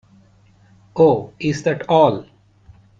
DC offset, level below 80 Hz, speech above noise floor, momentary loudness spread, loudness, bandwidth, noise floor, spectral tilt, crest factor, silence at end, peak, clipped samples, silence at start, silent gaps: under 0.1%; -56 dBFS; 36 dB; 12 LU; -17 LUFS; 7.8 kHz; -52 dBFS; -6.5 dB/octave; 18 dB; 0.75 s; 0 dBFS; under 0.1%; 0.95 s; none